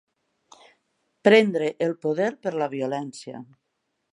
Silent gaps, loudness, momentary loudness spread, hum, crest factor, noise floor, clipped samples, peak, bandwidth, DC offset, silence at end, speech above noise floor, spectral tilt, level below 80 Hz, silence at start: none; -23 LUFS; 20 LU; none; 22 dB; -77 dBFS; under 0.1%; -2 dBFS; 11 kHz; under 0.1%; 0.7 s; 54 dB; -5.5 dB/octave; -78 dBFS; 1.25 s